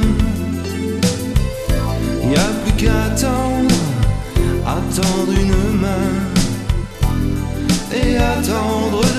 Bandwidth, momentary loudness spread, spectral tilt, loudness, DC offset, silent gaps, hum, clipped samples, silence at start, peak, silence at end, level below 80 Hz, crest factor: 14 kHz; 5 LU; -5.5 dB/octave; -18 LUFS; under 0.1%; none; none; under 0.1%; 0 s; 0 dBFS; 0 s; -22 dBFS; 16 dB